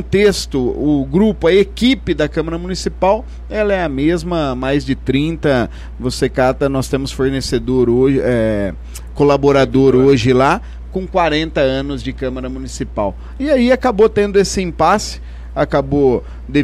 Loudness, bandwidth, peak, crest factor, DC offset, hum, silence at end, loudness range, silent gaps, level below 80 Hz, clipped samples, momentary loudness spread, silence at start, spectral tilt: -15 LUFS; 14 kHz; -2 dBFS; 12 dB; under 0.1%; none; 0 s; 4 LU; none; -30 dBFS; under 0.1%; 11 LU; 0 s; -6 dB/octave